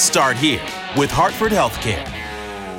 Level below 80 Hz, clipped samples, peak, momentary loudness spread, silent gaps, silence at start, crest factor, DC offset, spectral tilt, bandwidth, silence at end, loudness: -38 dBFS; under 0.1%; -2 dBFS; 13 LU; none; 0 s; 16 dB; under 0.1%; -3 dB/octave; 17 kHz; 0 s; -18 LUFS